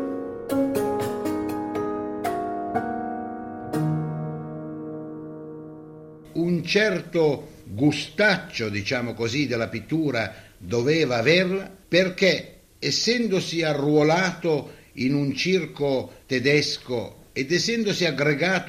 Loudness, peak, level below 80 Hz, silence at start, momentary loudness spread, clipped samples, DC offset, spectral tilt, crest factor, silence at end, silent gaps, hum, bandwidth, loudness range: -24 LUFS; -4 dBFS; -56 dBFS; 0 s; 14 LU; under 0.1%; under 0.1%; -5 dB/octave; 20 dB; 0 s; none; none; 15.5 kHz; 7 LU